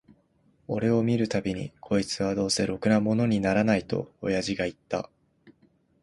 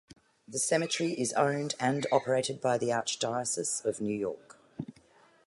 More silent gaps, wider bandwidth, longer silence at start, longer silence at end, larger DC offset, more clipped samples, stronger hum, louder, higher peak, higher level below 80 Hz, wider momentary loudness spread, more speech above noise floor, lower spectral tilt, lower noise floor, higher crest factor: neither; about the same, 11.5 kHz vs 11.5 kHz; first, 0.7 s vs 0.1 s; about the same, 0.55 s vs 0.55 s; neither; neither; neither; first, -27 LUFS vs -30 LUFS; first, -8 dBFS vs -12 dBFS; first, -54 dBFS vs -72 dBFS; second, 10 LU vs 16 LU; first, 39 dB vs 31 dB; first, -5.5 dB/octave vs -3.5 dB/octave; about the same, -65 dBFS vs -62 dBFS; about the same, 18 dB vs 20 dB